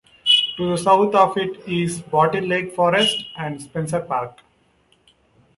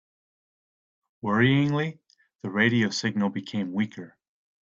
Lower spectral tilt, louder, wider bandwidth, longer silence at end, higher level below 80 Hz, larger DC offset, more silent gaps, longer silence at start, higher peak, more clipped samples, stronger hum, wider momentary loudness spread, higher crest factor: second, -4 dB/octave vs -6 dB/octave; first, -19 LUFS vs -25 LUFS; first, 11.5 kHz vs 7.8 kHz; first, 1.25 s vs 0.55 s; first, -58 dBFS vs -64 dBFS; neither; neither; second, 0.25 s vs 1.25 s; first, -2 dBFS vs -8 dBFS; neither; neither; about the same, 12 LU vs 12 LU; about the same, 18 dB vs 18 dB